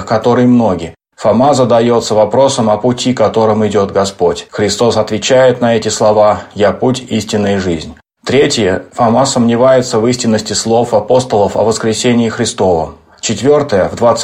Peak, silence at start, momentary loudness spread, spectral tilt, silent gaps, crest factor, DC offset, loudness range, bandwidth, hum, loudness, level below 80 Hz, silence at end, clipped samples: 0 dBFS; 0 s; 7 LU; -5 dB/octave; none; 10 dB; under 0.1%; 2 LU; 14 kHz; none; -11 LUFS; -44 dBFS; 0 s; under 0.1%